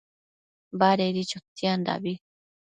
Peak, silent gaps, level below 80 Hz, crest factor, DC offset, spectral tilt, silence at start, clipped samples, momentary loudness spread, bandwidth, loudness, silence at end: -8 dBFS; 1.48-1.56 s; -72 dBFS; 20 dB; under 0.1%; -5.5 dB/octave; 0.75 s; under 0.1%; 14 LU; 9.4 kHz; -26 LUFS; 0.65 s